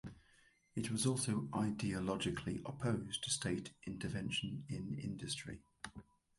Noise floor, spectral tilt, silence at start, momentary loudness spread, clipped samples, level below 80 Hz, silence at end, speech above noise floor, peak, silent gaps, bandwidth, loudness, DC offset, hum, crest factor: -71 dBFS; -4.5 dB/octave; 0.05 s; 14 LU; under 0.1%; -62 dBFS; 0.35 s; 30 dB; -22 dBFS; none; 11.5 kHz; -40 LUFS; under 0.1%; none; 20 dB